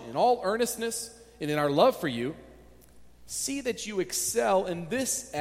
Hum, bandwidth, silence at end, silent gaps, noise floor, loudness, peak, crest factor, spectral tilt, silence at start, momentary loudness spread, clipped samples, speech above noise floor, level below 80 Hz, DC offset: none; 16.5 kHz; 0 s; none; -53 dBFS; -28 LUFS; -8 dBFS; 20 dB; -3.5 dB/octave; 0 s; 12 LU; under 0.1%; 25 dB; -60 dBFS; under 0.1%